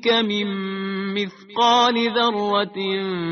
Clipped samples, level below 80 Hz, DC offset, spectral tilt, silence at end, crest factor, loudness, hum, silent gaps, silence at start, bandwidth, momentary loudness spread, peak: under 0.1%; -66 dBFS; under 0.1%; -2 dB/octave; 0 s; 16 dB; -21 LUFS; none; none; 0 s; 6.6 kHz; 10 LU; -4 dBFS